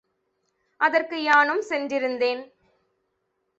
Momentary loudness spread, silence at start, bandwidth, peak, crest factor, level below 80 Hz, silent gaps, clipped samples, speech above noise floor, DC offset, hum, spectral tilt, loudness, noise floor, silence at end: 8 LU; 0.8 s; 8 kHz; -6 dBFS; 20 dB; -76 dBFS; none; under 0.1%; 53 dB; under 0.1%; none; -2.5 dB/octave; -22 LUFS; -75 dBFS; 1.15 s